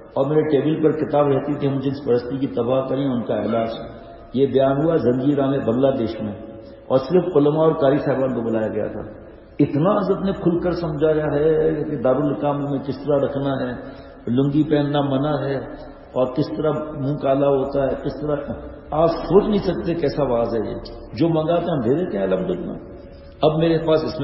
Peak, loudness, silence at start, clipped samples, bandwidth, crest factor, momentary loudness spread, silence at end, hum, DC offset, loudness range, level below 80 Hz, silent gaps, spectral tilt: -2 dBFS; -20 LUFS; 0 s; under 0.1%; 5.8 kHz; 18 dB; 11 LU; 0 s; none; under 0.1%; 3 LU; -44 dBFS; none; -10 dB/octave